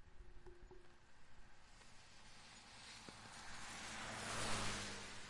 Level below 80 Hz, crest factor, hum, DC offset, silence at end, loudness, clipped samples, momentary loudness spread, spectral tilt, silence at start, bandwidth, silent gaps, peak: -62 dBFS; 20 dB; none; under 0.1%; 0 s; -48 LUFS; under 0.1%; 23 LU; -2.5 dB/octave; 0 s; 11.5 kHz; none; -30 dBFS